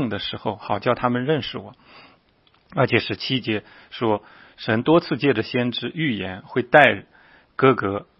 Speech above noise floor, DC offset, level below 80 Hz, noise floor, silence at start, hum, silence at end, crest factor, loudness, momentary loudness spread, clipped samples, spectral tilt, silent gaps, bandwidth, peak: 38 dB; under 0.1%; -58 dBFS; -60 dBFS; 0 s; none; 0.15 s; 22 dB; -21 LUFS; 12 LU; under 0.1%; -8 dB/octave; none; 6 kHz; 0 dBFS